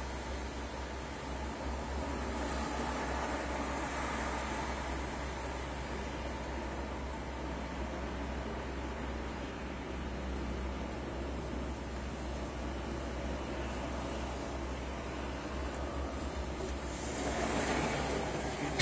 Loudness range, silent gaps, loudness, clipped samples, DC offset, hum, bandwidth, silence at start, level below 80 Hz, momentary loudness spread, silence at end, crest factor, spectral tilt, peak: 3 LU; none; -39 LUFS; under 0.1%; under 0.1%; none; 8 kHz; 0 s; -44 dBFS; 5 LU; 0 s; 20 dB; -5 dB/octave; -18 dBFS